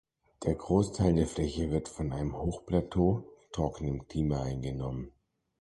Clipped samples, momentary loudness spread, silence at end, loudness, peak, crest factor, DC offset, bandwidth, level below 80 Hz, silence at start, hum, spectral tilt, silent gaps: under 0.1%; 9 LU; 0.5 s; -32 LUFS; -12 dBFS; 20 dB; under 0.1%; 11.5 kHz; -44 dBFS; 0.4 s; none; -7.5 dB/octave; none